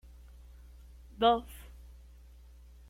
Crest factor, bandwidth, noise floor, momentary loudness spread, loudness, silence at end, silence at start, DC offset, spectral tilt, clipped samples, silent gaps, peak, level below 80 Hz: 24 dB; 16 kHz; -54 dBFS; 28 LU; -29 LUFS; 1.3 s; 1.2 s; under 0.1%; -5.5 dB/octave; under 0.1%; none; -12 dBFS; -52 dBFS